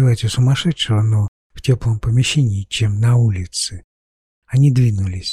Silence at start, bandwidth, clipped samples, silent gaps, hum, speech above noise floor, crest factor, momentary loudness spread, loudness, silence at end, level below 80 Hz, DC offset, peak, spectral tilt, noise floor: 0 s; 12 kHz; under 0.1%; 1.28-1.50 s, 3.84-4.42 s; none; over 74 dB; 12 dB; 7 LU; -17 LUFS; 0 s; -38 dBFS; under 0.1%; -4 dBFS; -5.5 dB/octave; under -90 dBFS